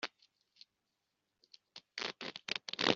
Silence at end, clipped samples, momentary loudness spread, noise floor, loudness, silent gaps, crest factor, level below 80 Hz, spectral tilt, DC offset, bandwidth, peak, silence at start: 0 s; under 0.1%; 23 LU; -86 dBFS; -41 LUFS; none; 32 dB; -82 dBFS; -0.5 dB/octave; under 0.1%; 7.6 kHz; -10 dBFS; 0 s